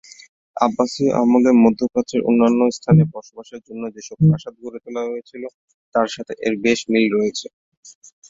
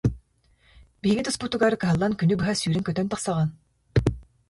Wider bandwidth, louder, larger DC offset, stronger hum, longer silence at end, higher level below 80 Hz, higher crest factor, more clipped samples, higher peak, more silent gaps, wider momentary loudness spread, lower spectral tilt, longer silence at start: second, 7.8 kHz vs 11.5 kHz; first, -18 LUFS vs -25 LUFS; neither; neither; first, 0.4 s vs 0.25 s; second, -54 dBFS vs -42 dBFS; about the same, 18 dB vs 18 dB; neither; first, 0 dBFS vs -8 dBFS; first, 5.54-5.68 s, 5.74-5.92 s, 7.53-7.83 s vs none; first, 20 LU vs 6 LU; about the same, -7 dB/octave vs -6 dB/octave; first, 0.55 s vs 0.05 s